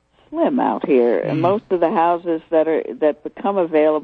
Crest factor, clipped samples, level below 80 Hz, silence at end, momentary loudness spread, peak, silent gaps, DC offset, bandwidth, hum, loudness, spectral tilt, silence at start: 14 dB; under 0.1%; -62 dBFS; 0 s; 5 LU; -4 dBFS; none; under 0.1%; 4.8 kHz; none; -18 LUFS; -9.5 dB/octave; 0.3 s